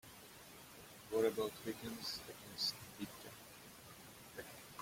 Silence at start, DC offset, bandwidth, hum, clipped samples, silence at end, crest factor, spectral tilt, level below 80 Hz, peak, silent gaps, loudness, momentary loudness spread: 0.05 s; under 0.1%; 16.5 kHz; none; under 0.1%; 0 s; 22 dB; -3.5 dB/octave; -74 dBFS; -24 dBFS; none; -43 LUFS; 18 LU